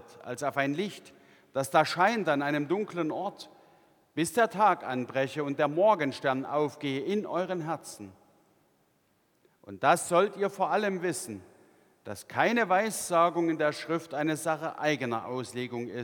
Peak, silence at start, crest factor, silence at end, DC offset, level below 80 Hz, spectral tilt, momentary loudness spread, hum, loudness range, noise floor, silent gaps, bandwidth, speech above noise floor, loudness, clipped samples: -8 dBFS; 0.1 s; 22 dB; 0 s; under 0.1%; -78 dBFS; -4.5 dB/octave; 14 LU; none; 4 LU; -70 dBFS; none; 19 kHz; 41 dB; -29 LUFS; under 0.1%